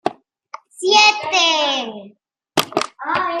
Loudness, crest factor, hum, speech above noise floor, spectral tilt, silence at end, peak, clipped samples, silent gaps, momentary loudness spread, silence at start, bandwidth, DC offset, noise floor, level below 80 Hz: -16 LUFS; 20 dB; none; 23 dB; -1 dB/octave; 0 s; 0 dBFS; under 0.1%; none; 15 LU; 0.05 s; 15.5 kHz; under 0.1%; -40 dBFS; -66 dBFS